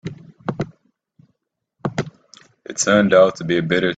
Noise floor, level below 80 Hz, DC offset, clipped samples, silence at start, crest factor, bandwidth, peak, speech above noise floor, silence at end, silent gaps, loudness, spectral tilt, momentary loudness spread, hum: -73 dBFS; -58 dBFS; under 0.1%; under 0.1%; 0.05 s; 20 dB; 9.4 kHz; -2 dBFS; 57 dB; 0 s; none; -18 LUFS; -4.5 dB/octave; 18 LU; none